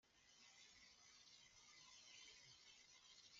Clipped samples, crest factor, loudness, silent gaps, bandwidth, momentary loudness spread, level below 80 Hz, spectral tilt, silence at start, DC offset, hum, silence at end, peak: under 0.1%; 16 dB; -65 LUFS; none; 7.4 kHz; 4 LU; under -90 dBFS; 1 dB/octave; 0.05 s; under 0.1%; none; 0 s; -52 dBFS